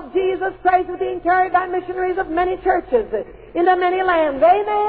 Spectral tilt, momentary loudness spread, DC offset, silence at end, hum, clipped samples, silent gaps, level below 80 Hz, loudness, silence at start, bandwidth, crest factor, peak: -9 dB/octave; 8 LU; 0.2%; 0 s; none; under 0.1%; none; -46 dBFS; -18 LUFS; 0 s; 4.7 kHz; 14 dB; -4 dBFS